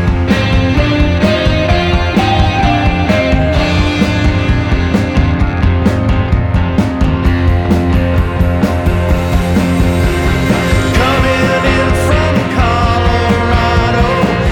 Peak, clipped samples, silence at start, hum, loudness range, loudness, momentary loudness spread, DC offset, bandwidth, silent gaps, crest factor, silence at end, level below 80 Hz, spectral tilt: 0 dBFS; under 0.1%; 0 s; none; 1 LU; -12 LUFS; 2 LU; under 0.1%; 16 kHz; none; 10 dB; 0 s; -18 dBFS; -6.5 dB/octave